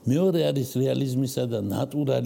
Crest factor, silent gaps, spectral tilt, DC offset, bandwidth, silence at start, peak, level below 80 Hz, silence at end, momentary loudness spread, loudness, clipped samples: 12 dB; none; -7 dB/octave; under 0.1%; 17 kHz; 0.05 s; -12 dBFS; -66 dBFS; 0 s; 5 LU; -25 LUFS; under 0.1%